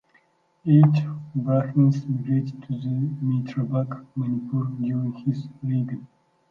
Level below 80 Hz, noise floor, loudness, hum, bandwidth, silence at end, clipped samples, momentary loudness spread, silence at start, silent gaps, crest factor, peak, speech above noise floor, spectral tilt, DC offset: -68 dBFS; -63 dBFS; -24 LUFS; none; 5.8 kHz; 0.45 s; under 0.1%; 11 LU; 0.65 s; none; 18 dB; -6 dBFS; 40 dB; -10.5 dB/octave; under 0.1%